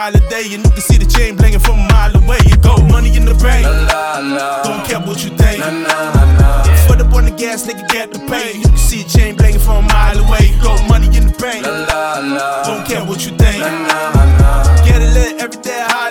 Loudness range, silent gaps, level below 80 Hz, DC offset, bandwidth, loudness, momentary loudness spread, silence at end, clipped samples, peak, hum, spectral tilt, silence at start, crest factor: 3 LU; none; -10 dBFS; under 0.1%; 18 kHz; -12 LUFS; 9 LU; 0 s; under 0.1%; 0 dBFS; none; -5.5 dB/octave; 0 s; 10 dB